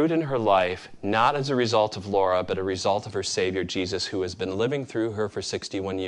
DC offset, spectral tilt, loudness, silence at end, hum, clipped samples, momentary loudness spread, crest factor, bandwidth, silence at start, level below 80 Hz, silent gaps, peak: under 0.1%; -4.5 dB/octave; -25 LUFS; 0 s; none; under 0.1%; 7 LU; 20 dB; 11 kHz; 0 s; -52 dBFS; none; -6 dBFS